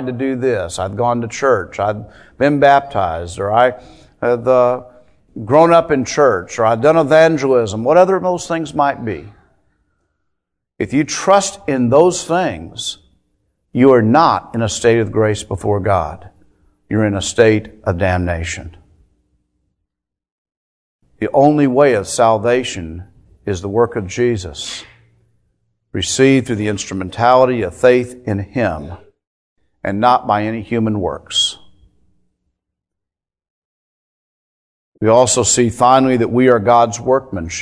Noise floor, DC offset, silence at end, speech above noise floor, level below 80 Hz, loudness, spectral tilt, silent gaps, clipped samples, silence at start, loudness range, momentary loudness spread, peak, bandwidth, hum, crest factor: -83 dBFS; under 0.1%; 0 s; 69 dB; -44 dBFS; -15 LUFS; -5 dB/octave; 20.32-20.45 s, 20.57-20.99 s, 29.27-29.56 s, 33.50-34.92 s; under 0.1%; 0 s; 7 LU; 13 LU; 0 dBFS; 11 kHz; none; 16 dB